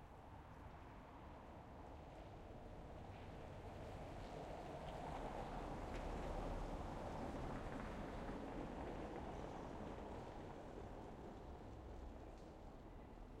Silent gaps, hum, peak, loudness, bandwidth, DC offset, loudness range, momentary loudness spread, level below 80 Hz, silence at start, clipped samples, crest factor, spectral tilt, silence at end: none; none; -36 dBFS; -53 LUFS; 14 kHz; under 0.1%; 7 LU; 9 LU; -56 dBFS; 0 s; under 0.1%; 16 dB; -6.5 dB/octave; 0 s